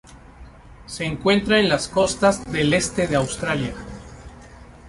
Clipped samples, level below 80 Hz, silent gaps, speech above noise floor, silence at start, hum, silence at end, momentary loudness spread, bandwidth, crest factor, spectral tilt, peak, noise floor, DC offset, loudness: under 0.1%; -44 dBFS; none; 23 dB; 0.1 s; none; 0 s; 20 LU; 11.5 kHz; 20 dB; -4.5 dB/octave; -4 dBFS; -44 dBFS; under 0.1%; -20 LUFS